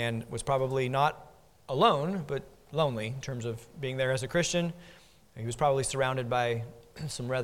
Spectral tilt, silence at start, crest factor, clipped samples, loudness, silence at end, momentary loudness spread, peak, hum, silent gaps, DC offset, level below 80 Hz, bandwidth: -5 dB/octave; 0 s; 22 dB; under 0.1%; -30 LUFS; 0 s; 12 LU; -8 dBFS; none; none; under 0.1%; -56 dBFS; 16.5 kHz